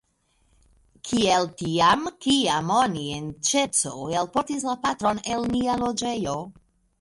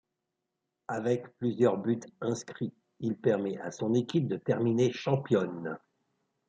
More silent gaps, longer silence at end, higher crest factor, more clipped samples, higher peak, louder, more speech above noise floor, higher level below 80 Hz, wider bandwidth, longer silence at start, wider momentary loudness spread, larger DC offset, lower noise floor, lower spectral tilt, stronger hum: neither; second, 0.5 s vs 0.7 s; about the same, 18 dB vs 18 dB; neither; first, -6 dBFS vs -12 dBFS; first, -24 LUFS vs -31 LUFS; second, 43 dB vs 55 dB; first, -54 dBFS vs -74 dBFS; first, 11.5 kHz vs 9 kHz; first, 1.05 s vs 0.9 s; second, 8 LU vs 11 LU; neither; second, -67 dBFS vs -85 dBFS; second, -3.5 dB/octave vs -7 dB/octave; neither